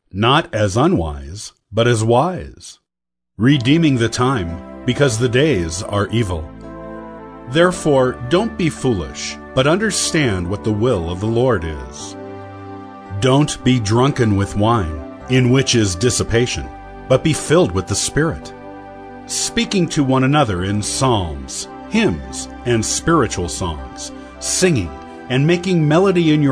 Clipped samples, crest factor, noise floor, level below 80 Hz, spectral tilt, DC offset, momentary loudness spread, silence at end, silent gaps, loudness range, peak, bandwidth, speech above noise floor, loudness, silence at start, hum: under 0.1%; 16 dB; -84 dBFS; -38 dBFS; -5 dB/octave; under 0.1%; 18 LU; 0 s; none; 3 LU; 0 dBFS; 11 kHz; 68 dB; -17 LUFS; 0.15 s; none